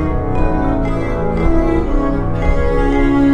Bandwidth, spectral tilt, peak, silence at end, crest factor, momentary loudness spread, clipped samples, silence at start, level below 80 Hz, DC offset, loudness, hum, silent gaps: 7 kHz; -9 dB/octave; 0 dBFS; 0 s; 12 dB; 4 LU; under 0.1%; 0 s; -18 dBFS; 4%; -17 LUFS; none; none